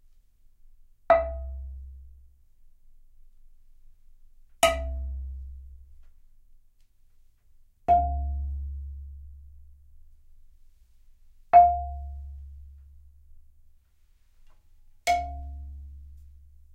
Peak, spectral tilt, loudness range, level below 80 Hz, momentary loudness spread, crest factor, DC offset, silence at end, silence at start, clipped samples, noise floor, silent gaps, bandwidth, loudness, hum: -6 dBFS; -4 dB/octave; 14 LU; -40 dBFS; 27 LU; 24 dB; under 0.1%; 0.45 s; 1.1 s; under 0.1%; -60 dBFS; none; 16 kHz; -26 LUFS; none